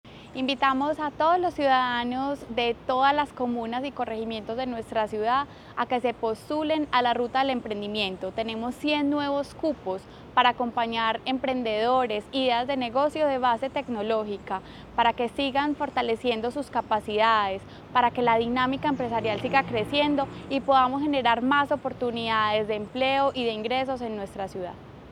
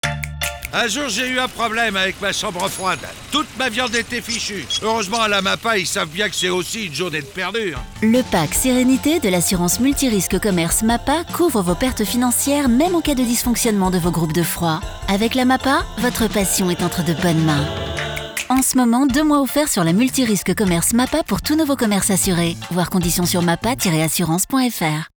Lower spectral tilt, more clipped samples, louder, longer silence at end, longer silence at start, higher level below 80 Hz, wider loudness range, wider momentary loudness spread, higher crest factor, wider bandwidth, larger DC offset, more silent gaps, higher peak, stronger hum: first, -5.5 dB/octave vs -4 dB/octave; neither; second, -26 LUFS vs -18 LUFS; about the same, 0 s vs 0.1 s; about the same, 0.05 s vs 0.05 s; second, -56 dBFS vs -38 dBFS; about the same, 3 LU vs 3 LU; first, 9 LU vs 6 LU; first, 20 dB vs 12 dB; second, 13.5 kHz vs over 20 kHz; neither; neither; about the same, -6 dBFS vs -8 dBFS; neither